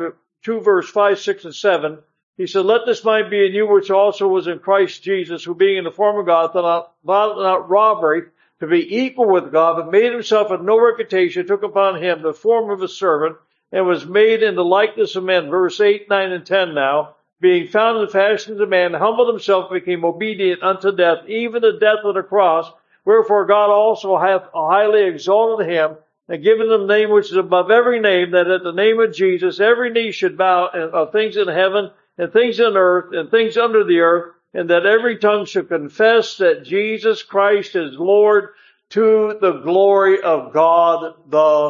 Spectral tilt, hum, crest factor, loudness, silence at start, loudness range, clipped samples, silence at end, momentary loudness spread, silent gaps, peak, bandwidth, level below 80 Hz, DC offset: -5 dB/octave; none; 16 dB; -16 LUFS; 0 s; 2 LU; under 0.1%; 0 s; 7 LU; 2.23-2.33 s; 0 dBFS; 7.4 kHz; -74 dBFS; under 0.1%